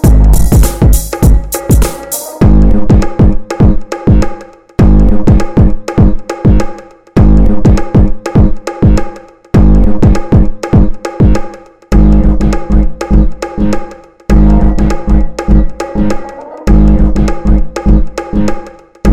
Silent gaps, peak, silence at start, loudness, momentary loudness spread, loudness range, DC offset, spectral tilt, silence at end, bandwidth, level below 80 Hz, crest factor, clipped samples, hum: none; 0 dBFS; 0 s; -10 LUFS; 8 LU; 2 LU; 6%; -7.5 dB/octave; 0 s; 16 kHz; -10 dBFS; 8 dB; 0.3%; none